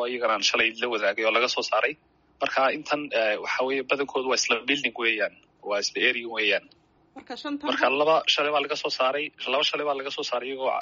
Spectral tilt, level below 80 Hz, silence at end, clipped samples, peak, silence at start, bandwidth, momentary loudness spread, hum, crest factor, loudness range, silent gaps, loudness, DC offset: 1 dB/octave; -72 dBFS; 0 s; under 0.1%; -8 dBFS; 0 s; 7.4 kHz; 8 LU; none; 18 dB; 1 LU; none; -25 LUFS; under 0.1%